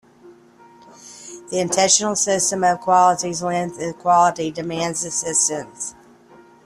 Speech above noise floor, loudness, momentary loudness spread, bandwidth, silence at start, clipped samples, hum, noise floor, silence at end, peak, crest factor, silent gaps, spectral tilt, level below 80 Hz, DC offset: 29 dB; -18 LUFS; 15 LU; 13 kHz; 0.25 s; under 0.1%; none; -48 dBFS; 0.75 s; -2 dBFS; 18 dB; none; -2.5 dB/octave; -62 dBFS; under 0.1%